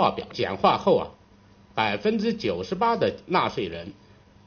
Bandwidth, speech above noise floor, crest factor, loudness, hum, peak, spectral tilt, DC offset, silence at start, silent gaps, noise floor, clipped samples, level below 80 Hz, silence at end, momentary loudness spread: 6.8 kHz; 30 dB; 20 dB; -25 LUFS; none; -6 dBFS; -3.5 dB/octave; under 0.1%; 0 s; none; -54 dBFS; under 0.1%; -56 dBFS; 0.55 s; 12 LU